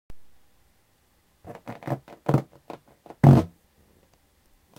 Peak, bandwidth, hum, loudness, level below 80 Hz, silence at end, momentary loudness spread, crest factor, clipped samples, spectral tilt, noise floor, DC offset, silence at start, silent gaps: -2 dBFS; 8.6 kHz; none; -22 LUFS; -52 dBFS; 1.35 s; 28 LU; 26 dB; under 0.1%; -9.5 dB/octave; -65 dBFS; under 0.1%; 0.1 s; none